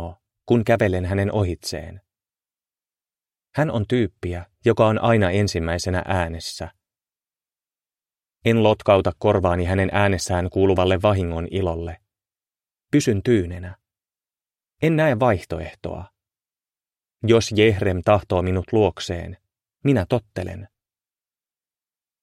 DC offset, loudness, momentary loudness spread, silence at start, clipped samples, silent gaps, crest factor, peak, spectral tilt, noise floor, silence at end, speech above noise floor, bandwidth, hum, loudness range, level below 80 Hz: under 0.1%; -21 LUFS; 14 LU; 0 s; under 0.1%; none; 20 dB; -2 dBFS; -6.5 dB/octave; under -90 dBFS; 1.55 s; over 70 dB; 13.5 kHz; none; 6 LU; -44 dBFS